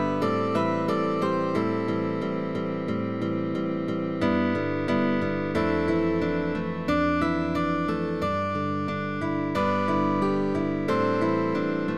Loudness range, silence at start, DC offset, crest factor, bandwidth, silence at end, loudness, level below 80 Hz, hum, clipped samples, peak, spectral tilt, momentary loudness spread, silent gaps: 2 LU; 0 s; 0.5%; 14 dB; 11.5 kHz; 0 s; -26 LUFS; -54 dBFS; none; under 0.1%; -10 dBFS; -7.5 dB/octave; 5 LU; none